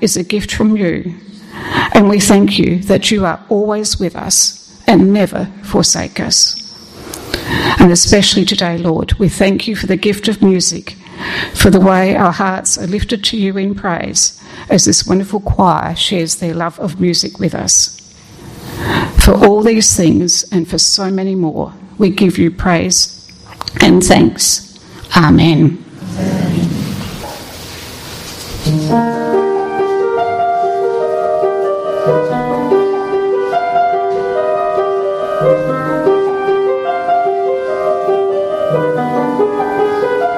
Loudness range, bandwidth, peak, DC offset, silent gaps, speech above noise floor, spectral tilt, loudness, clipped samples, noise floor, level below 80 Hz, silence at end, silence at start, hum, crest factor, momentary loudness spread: 4 LU; 15.5 kHz; 0 dBFS; under 0.1%; none; 25 dB; -4 dB/octave; -12 LUFS; 0.1%; -36 dBFS; -30 dBFS; 0 s; 0 s; none; 12 dB; 13 LU